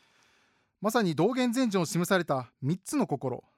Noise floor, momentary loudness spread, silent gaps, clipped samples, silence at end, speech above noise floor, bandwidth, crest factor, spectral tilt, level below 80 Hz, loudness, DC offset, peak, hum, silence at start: -69 dBFS; 7 LU; none; under 0.1%; 0.2 s; 41 dB; 16.5 kHz; 16 dB; -5.5 dB/octave; -74 dBFS; -29 LUFS; under 0.1%; -12 dBFS; none; 0.8 s